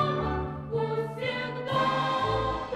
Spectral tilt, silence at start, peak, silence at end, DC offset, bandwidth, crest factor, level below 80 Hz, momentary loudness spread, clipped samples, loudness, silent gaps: -6.5 dB/octave; 0 s; -14 dBFS; 0 s; under 0.1%; 12.5 kHz; 14 dB; -44 dBFS; 6 LU; under 0.1%; -29 LUFS; none